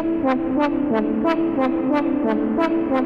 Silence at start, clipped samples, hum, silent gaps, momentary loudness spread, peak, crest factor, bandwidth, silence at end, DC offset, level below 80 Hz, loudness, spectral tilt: 0 s; under 0.1%; none; none; 1 LU; -8 dBFS; 12 dB; 6.4 kHz; 0 s; under 0.1%; -48 dBFS; -20 LUFS; -8 dB/octave